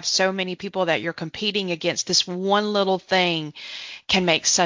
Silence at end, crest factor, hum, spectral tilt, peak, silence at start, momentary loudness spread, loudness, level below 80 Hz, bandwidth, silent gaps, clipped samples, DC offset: 0 s; 20 dB; none; -2.5 dB/octave; -4 dBFS; 0 s; 10 LU; -22 LUFS; -58 dBFS; 7.6 kHz; none; under 0.1%; under 0.1%